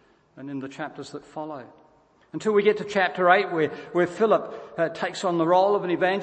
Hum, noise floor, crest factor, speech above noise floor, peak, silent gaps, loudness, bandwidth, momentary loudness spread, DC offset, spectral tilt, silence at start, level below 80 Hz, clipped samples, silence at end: none; -59 dBFS; 20 dB; 35 dB; -4 dBFS; none; -23 LUFS; 8.6 kHz; 17 LU; under 0.1%; -5.5 dB/octave; 0.35 s; -72 dBFS; under 0.1%; 0 s